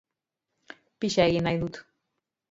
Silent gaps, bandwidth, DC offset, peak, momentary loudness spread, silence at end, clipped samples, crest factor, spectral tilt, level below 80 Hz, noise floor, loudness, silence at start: none; 7.8 kHz; under 0.1%; -8 dBFS; 13 LU; 0.7 s; under 0.1%; 22 dB; -5.5 dB/octave; -56 dBFS; -85 dBFS; -26 LUFS; 1 s